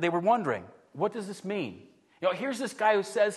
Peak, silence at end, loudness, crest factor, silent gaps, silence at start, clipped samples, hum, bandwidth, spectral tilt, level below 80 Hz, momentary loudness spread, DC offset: -12 dBFS; 0 s; -30 LUFS; 18 dB; none; 0 s; under 0.1%; none; 12.5 kHz; -5 dB/octave; -78 dBFS; 11 LU; under 0.1%